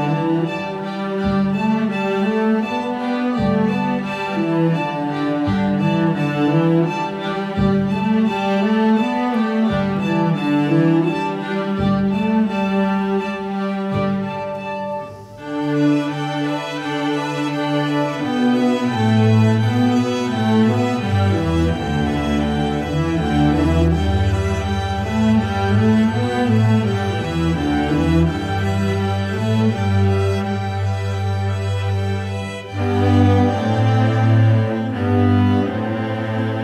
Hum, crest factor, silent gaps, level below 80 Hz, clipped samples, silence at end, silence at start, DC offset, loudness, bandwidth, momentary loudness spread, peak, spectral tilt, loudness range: none; 14 dB; none; -36 dBFS; under 0.1%; 0 s; 0 s; under 0.1%; -19 LUFS; 11.5 kHz; 7 LU; -2 dBFS; -7.5 dB/octave; 4 LU